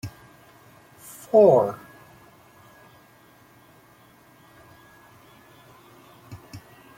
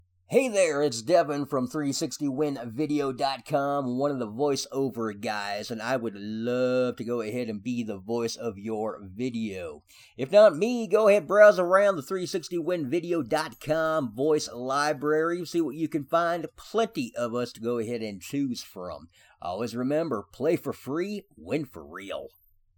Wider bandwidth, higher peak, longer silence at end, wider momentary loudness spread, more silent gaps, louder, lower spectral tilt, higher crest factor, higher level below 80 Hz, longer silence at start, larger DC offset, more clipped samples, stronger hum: second, 16.5 kHz vs 19.5 kHz; about the same, -4 dBFS vs -6 dBFS; about the same, 0.4 s vs 0.5 s; first, 30 LU vs 12 LU; neither; first, -19 LUFS vs -27 LUFS; first, -7 dB/octave vs -5 dB/octave; about the same, 22 dB vs 22 dB; about the same, -64 dBFS vs -66 dBFS; second, 0.05 s vs 0.3 s; neither; neither; neither